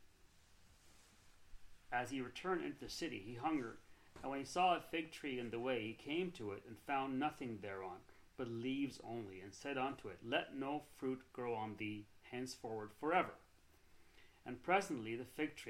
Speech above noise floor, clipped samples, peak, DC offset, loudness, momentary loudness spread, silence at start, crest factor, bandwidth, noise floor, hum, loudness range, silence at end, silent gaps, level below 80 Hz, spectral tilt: 25 dB; under 0.1%; -22 dBFS; under 0.1%; -43 LUFS; 13 LU; 0 s; 22 dB; 16 kHz; -68 dBFS; none; 3 LU; 0 s; none; -70 dBFS; -5 dB/octave